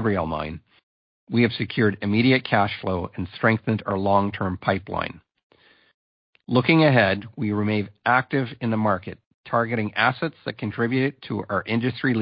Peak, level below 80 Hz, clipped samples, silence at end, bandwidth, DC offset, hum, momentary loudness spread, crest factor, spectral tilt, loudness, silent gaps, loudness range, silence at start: -4 dBFS; -50 dBFS; under 0.1%; 0 s; 5.4 kHz; under 0.1%; none; 11 LU; 18 dB; -11 dB/octave; -23 LUFS; 0.83-1.27 s, 5.43-5.50 s, 5.94-6.33 s, 9.26-9.44 s; 3 LU; 0 s